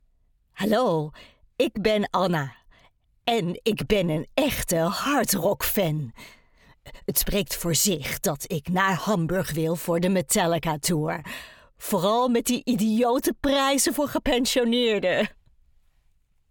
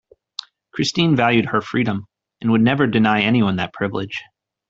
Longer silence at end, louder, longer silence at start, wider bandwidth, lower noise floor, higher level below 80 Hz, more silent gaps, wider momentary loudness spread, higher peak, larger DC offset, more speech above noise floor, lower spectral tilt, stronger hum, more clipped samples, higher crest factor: first, 1.2 s vs 0.45 s; second, -24 LUFS vs -18 LUFS; second, 0.55 s vs 0.75 s; first, over 20 kHz vs 7.8 kHz; first, -64 dBFS vs -38 dBFS; first, -46 dBFS vs -56 dBFS; neither; second, 8 LU vs 17 LU; second, -6 dBFS vs -2 dBFS; neither; first, 40 dB vs 20 dB; second, -4 dB/octave vs -6 dB/octave; neither; neither; about the same, 18 dB vs 18 dB